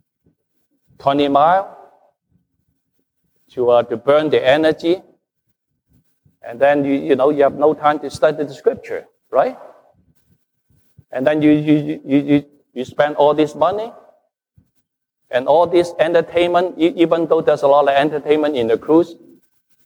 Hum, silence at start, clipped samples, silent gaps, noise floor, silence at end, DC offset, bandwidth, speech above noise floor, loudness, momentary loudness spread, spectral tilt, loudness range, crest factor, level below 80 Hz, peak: none; 1.05 s; under 0.1%; none; -71 dBFS; 0.7 s; under 0.1%; 11 kHz; 56 dB; -16 LUFS; 10 LU; -6.5 dB/octave; 5 LU; 16 dB; -58 dBFS; -2 dBFS